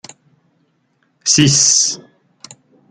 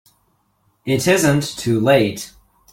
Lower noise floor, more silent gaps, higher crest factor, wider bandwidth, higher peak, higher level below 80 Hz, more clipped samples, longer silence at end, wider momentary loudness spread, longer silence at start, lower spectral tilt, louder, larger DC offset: about the same, -62 dBFS vs -63 dBFS; neither; about the same, 18 dB vs 18 dB; second, 11 kHz vs 16.5 kHz; about the same, 0 dBFS vs -2 dBFS; about the same, -54 dBFS vs -50 dBFS; neither; first, 0.9 s vs 0.45 s; second, 12 LU vs 17 LU; first, 1.25 s vs 0.85 s; second, -2 dB/octave vs -5 dB/octave; first, -11 LUFS vs -17 LUFS; neither